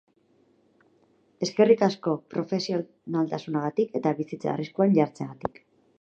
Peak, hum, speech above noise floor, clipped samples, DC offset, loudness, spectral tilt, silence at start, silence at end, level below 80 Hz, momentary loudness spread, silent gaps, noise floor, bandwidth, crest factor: -6 dBFS; none; 39 dB; under 0.1%; under 0.1%; -26 LUFS; -6.5 dB/octave; 1.4 s; 0.55 s; -68 dBFS; 11 LU; none; -64 dBFS; 8 kHz; 20 dB